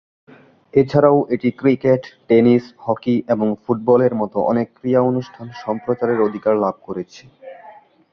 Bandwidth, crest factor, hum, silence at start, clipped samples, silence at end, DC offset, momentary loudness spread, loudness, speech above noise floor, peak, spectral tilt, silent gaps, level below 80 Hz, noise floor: 6.8 kHz; 18 dB; none; 0.75 s; under 0.1%; 0.4 s; under 0.1%; 13 LU; -18 LUFS; 27 dB; 0 dBFS; -9 dB/octave; none; -56 dBFS; -44 dBFS